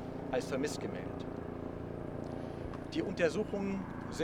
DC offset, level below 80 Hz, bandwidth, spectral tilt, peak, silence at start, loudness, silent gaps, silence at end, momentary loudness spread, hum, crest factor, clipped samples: under 0.1%; -56 dBFS; 16.5 kHz; -6 dB/octave; -18 dBFS; 0 s; -38 LUFS; none; 0 s; 10 LU; none; 20 dB; under 0.1%